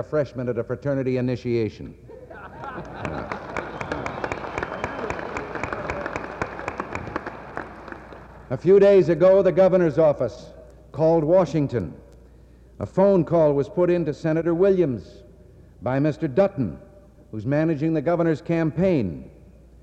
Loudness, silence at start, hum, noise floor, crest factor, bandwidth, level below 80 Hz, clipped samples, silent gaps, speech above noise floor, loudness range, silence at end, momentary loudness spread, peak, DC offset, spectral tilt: -22 LUFS; 0 s; none; -49 dBFS; 16 dB; 8.2 kHz; -48 dBFS; under 0.1%; none; 29 dB; 11 LU; 0.5 s; 18 LU; -8 dBFS; under 0.1%; -8.5 dB/octave